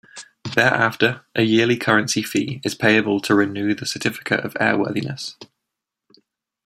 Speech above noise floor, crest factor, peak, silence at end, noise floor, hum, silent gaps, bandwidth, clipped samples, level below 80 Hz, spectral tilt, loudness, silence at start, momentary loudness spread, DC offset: 63 dB; 20 dB; 0 dBFS; 1.2 s; -82 dBFS; none; none; 15 kHz; under 0.1%; -62 dBFS; -4.5 dB/octave; -19 LUFS; 0.15 s; 9 LU; under 0.1%